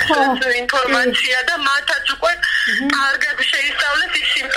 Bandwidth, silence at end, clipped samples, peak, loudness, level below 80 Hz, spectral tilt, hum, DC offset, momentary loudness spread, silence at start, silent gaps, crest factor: 16.5 kHz; 0 s; under 0.1%; 0 dBFS; -16 LUFS; -48 dBFS; -1.5 dB/octave; none; under 0.1%; 2 LU; 0 s; none; 16 dB